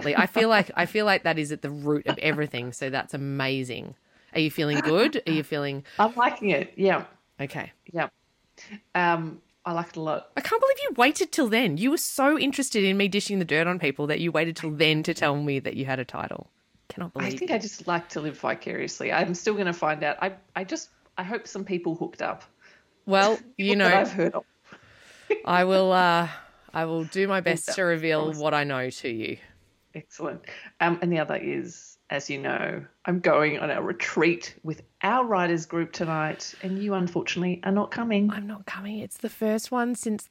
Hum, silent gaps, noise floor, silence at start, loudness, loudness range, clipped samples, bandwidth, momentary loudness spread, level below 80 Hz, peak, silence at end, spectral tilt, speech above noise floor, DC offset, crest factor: none; none; -58 dBFS; 0 s; -26 LUFS; 6 LU; under 0.1%; 16 kHz; 14 LU; -70 dBFS; -4 dBFS; 0.05 s; -4.5 dB/octave; 32 dB; under 0.1%; 22 dB